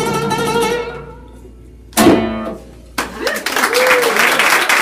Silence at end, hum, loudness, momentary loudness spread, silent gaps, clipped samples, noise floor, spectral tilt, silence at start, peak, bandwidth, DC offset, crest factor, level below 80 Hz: 0 s; none; -14 LUFS; 15 LU; none; under 0.1%; -37 dBFS; -3 dB/octave; 0 s; 0 dBFS; 16 kHz; under 0.1%; 16 dB; -40 dBFS